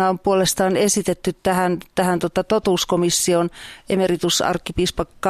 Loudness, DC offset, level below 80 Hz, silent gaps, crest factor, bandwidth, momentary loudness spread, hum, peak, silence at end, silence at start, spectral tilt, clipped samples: -19 LUFS; under 0.1%; -42 dBFS; none; 14 dB; 14.5 kHz; 5 LU; none; -6 dBFS; 0 s; 0 s; -4 dB/octave; under 0.1%